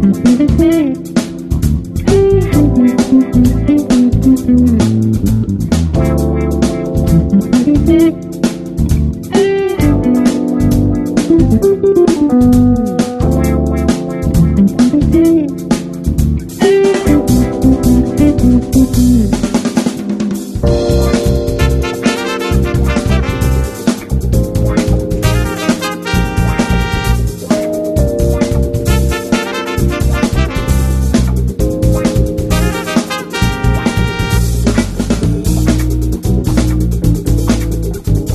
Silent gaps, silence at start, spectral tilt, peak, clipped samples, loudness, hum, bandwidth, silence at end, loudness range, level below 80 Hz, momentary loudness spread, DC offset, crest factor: none; 0 s; -6.5 dB/octave; 0 dBFS; under 0.1%; -12 LUFS; none; 13.5 kHz; 0 s; 4 LU; -18 dBFS; 6 LU; under 0.1%; 12 dB